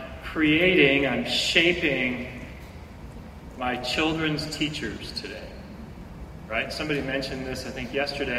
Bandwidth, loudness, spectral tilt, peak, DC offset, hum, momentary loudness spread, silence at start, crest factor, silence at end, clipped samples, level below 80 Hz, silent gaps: 15.5 kHz; -24 LUFS; -4.5 dB/octave; -4 dBFS; under 0.1%; none; 23 LU; 0 s; 22 dB; 0 s; under 0.1%; -44 dBFS; none